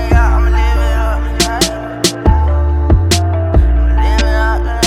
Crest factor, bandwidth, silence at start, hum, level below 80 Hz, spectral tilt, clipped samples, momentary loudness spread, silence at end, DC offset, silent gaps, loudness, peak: 10 dB; 15 kHz; 0 s; none; -12 dBFS; -5 dB/octave; under 0.1%; 4 LU; 0 s; under 0.1%; none; -13 LUFS; 0 dBFS